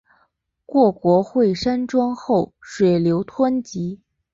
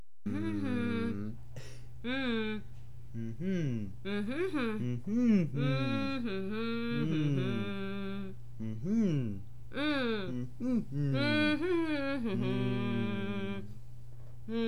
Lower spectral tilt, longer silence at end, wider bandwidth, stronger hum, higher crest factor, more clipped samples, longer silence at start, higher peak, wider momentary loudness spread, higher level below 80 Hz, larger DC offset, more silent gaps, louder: about the same, -7.5 dB/octave vs -7.5 dB/octave; first, 0.4 s vs 0 s; second, 7.8 kHz vs 11.5 kHz; neither; about the same, 16 dB vs 16 dB; neither; first, 0.7 s vs 0.25 s; first, -4 dBFS vs -18 dBFS; second, 12 LU vs 16 LU; about the same, -54 dBFS vs -56 dBFS; second, under 0.1% vs 1%; neither; first, -20 LUFS vs -34 LUFS